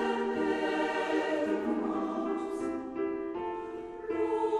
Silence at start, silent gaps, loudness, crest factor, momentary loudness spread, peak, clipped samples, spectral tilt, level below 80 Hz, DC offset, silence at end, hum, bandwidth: 0 s; none; -32 LUFS; 14 dB; 7 LU; -18 dBFS; under 0.1%; -5.5 dB/octave; -64 dBFS; under 0.1%; 0 s; none; 11 kHz